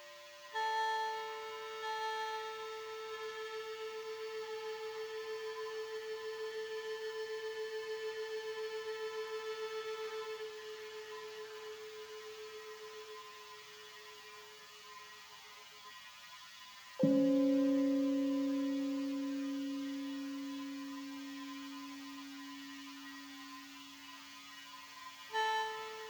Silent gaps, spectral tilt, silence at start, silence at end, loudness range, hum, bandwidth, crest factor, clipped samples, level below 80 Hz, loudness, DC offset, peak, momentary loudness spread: none; -4.5 dB/octave; 0 s; 0 s; 15 LU; none; over 20 kHz; 22 dB; under 0.1%; -86 dBFS; -40 LUFS; under 0.1%; -18 dBFS; 17 LU